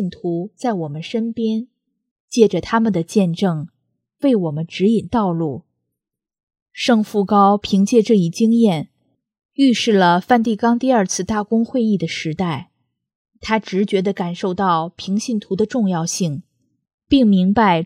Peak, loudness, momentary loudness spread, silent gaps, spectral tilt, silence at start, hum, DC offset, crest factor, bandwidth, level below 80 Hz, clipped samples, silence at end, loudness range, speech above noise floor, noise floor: 0 dBFS; -18 LUFS; 10 LU; 2.11-2.28 s, 6.43-6.47 s, 6.62-6.66 s, 9.45-9.49 s, 13.15-13.25 s, 16.94-16.98 s; -5.5 dB/octave; 0 s; none; under 0.1%; 18 dB; 13 kHz; -52 dBFS; under 0.1%; 0 s; 5 LU; 65 dB; -82 dBFS